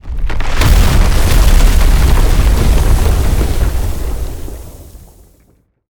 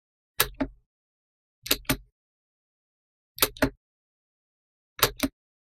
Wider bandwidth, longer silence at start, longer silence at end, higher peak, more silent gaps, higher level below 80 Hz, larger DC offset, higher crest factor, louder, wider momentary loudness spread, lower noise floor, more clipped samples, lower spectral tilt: first, 20 kHz vs 16 kHz; second, 0.05 s vs 0.4 s; first, 0.95 s vs 0.35 s; about the same, 0 dBFS vs 0 dBFS; second, none vs 0.86-1.62 s, 2.12-3.35 s, 3.77-4.96 s; first, -12 dBFS vs -48 dBFS; neither; second, 10 dB vs 32 dB; first, -14 LUFS vs -27 LUFS; second, 13 LU vs 20 LU; second, -52 dBFS vs under -90 dBFS; neither; first, -5 dB/octave vs -2.5 dB/octave